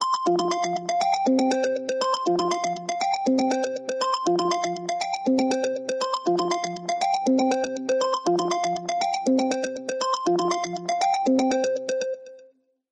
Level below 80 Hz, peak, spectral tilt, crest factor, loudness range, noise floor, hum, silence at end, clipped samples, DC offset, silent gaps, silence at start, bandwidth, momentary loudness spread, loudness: -70 dBFS; -12 dBFS; -4 dB/octave; 12 dB; 1 LU; -57 dBFS; none; 0.5 s; under 0.1%; under 0.1%; none; 0 s; 11 kHz; 6 LU; -24 LUFS